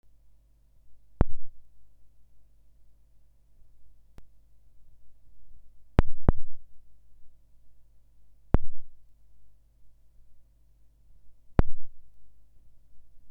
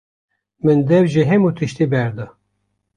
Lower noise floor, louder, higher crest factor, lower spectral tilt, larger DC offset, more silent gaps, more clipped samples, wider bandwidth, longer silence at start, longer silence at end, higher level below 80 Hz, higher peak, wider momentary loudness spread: second, -59 dBFS vs -70 dBFS; second, -31 LUFS vs -16 LUFS; first, 24 dB vs 14 dB; first, -9.5 dB/octave vs -8 dB/octave; neither; neither; neither; second, 3.4 kHz vs 10 kHz; first, 0.9 s vs 0.65 s; second, 0 s vs 0.7 s; first, -36 dBFS vs -54 dBFS; about the same, -2 dBFS vs -2 dBFS; first, 22 LU vs 12 LU